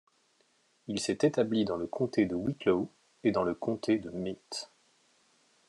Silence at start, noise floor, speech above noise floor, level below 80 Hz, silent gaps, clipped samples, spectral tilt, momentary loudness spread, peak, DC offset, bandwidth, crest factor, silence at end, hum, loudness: 0.9 s; -70 dBFS; 40 dB; -70 dBFS; none; under 0.1%; -5.5 dB/octave; 12 LU; -12 dBFS; under 0.1%; 11.5 kHz; 20 dB; 1.05 s; none; -31 LUFS